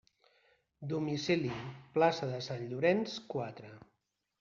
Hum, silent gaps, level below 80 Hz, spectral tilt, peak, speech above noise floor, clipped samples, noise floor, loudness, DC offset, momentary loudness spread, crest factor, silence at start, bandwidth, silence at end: none; none; -72 dBFS; -4.5 dB/octave; -14 dBFS; 37 dB; under 0.1%; -71 dBFS; -34 LUFS; under 0.1%; 14 LU; 22 dB; 0.8 s; 7.4 kHz; 0.6 s